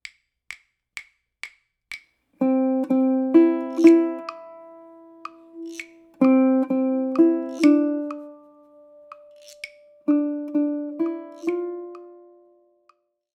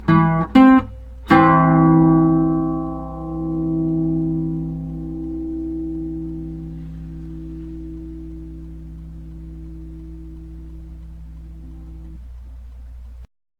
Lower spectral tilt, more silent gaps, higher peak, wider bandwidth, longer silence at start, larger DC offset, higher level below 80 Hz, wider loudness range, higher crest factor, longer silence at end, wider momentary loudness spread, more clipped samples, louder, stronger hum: second, -6 dB/octave vs -9.5 dB/octave; neither; about the same, -2 dBFS vs 0 dBFS; first, 9.2 kHz vs 5.2 kHz; first, 0.5 s vs 0 s; neither; second, -78 dBFS vs -36 dBFS; second, 7 LU vs 22 LU; about the same, 20 dB vs 20 dB; first, 1.25 s vs 0.35 s; about the same, 24 LU vs 26 LU; neither; second, -21 LUFS vs -17 LUFS; neither